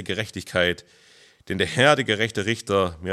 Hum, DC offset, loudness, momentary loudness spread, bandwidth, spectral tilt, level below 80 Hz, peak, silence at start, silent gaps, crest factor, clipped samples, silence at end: none; under 0.1%; -22 LUFS; 11 LU; 14 kHz; -4.5 dB/octave; -58 dBFS; -2 dBFS; 0 s; none; 20 dB; under 0.1%; 0 s